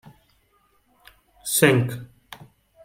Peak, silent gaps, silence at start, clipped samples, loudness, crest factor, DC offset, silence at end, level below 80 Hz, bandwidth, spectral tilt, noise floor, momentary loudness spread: -2 dBFS; none; 1.45 s; under 0.1%; -20 LUFS; 24 dB; under 0.1%; 0.5 s; -62 dBFS; 16.5 kHz; -4.5 dB/octave; -64 dBFS; 27 LU